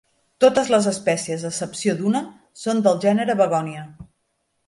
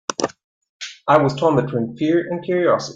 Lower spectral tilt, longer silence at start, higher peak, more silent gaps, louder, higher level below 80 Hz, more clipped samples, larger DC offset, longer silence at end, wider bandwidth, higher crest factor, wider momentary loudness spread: about the same, -5 dB/octave vs -5.5 dB/octave; first, 0.4 s vs 0.1 s; about the same, -4 dBFS vs -2 dBFS; second, none vs 0.44-0.61 s, 0.69-0.80 s; about the same, -20 LUFS vs -19 LUFS; about the same, -62 dBFS vs -58 dBFS; neither; neither; first, 0.65 s vs 0 s; first, 11.5 kHz vs 9.2 kHz; about the same, 18 dB vs 18 dB; about the same, 13 LU vs 12 LU